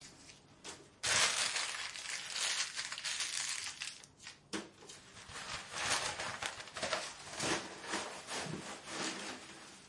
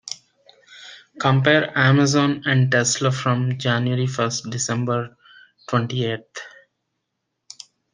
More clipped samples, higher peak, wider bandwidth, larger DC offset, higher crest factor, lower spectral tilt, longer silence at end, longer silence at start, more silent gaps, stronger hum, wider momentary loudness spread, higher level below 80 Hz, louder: neither; second, -16 dBFS vs -2 dBFS; first, 11.5 kHz vs 9.8 kHz; neither; about the same, 24 dB vs 20 dB; second, -0.5 dB/octave vs -4.5 dB/octave; second, 0 s vs 1.45 s; about the same, 0 s vs 0.05 s; neither; neither; second, 18 LU vs 24 LU; second, -72 dBFS vs -64 dBFS; second, -37 LUFS vs -20 LUFS